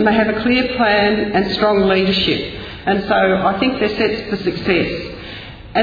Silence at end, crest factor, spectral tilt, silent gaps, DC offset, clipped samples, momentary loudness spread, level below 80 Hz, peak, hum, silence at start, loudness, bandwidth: 0 s; 14 dB; -7 dB/octave; none; under 0.1%; under 0.1%; 12 LU; -40 dBFS; -2 dBFS; none; 0 s; -16 LUFS; 5 kHz